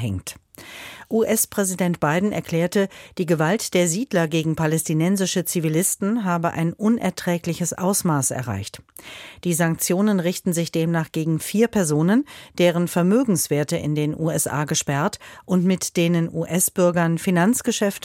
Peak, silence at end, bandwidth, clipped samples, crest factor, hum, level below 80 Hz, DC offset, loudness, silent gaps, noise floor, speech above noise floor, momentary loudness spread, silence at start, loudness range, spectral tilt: -6 dBFS; 0.05 s; 16.5 kHz; under 0.1%; 14 dB; none; -56 dBFS; under 0.1%; -21 LUFS; none; -40 dBFS; 19 dB; 10 LU; 0 s; 2 LU; -5 dB/octave